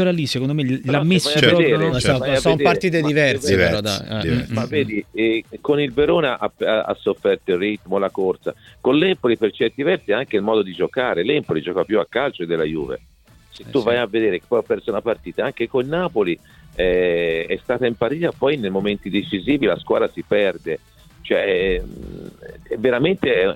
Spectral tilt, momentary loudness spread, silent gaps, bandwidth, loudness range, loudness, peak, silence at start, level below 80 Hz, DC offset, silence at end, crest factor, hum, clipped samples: -5.5 dB/octave; 7 LU; none; 16.5 kHz; 5 LU; -19 LUFS; 0 dBFS; 0 s; -44 dBFS; under 0.1%; 0 s; 18 dB; none; under 0.1%